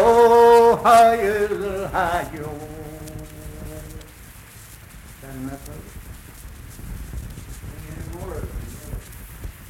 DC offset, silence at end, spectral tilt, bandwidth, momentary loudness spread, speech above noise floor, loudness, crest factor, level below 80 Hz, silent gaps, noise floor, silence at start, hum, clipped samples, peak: under 0.1%; 0 s; -5 dB/octave; 16.5 kHz; 27 LU; 24 dB; -16 LUFS; 18 dB; -40 dBFS; none; -42 dBFS; 0 s; none; under 0.1%; -4 dBFS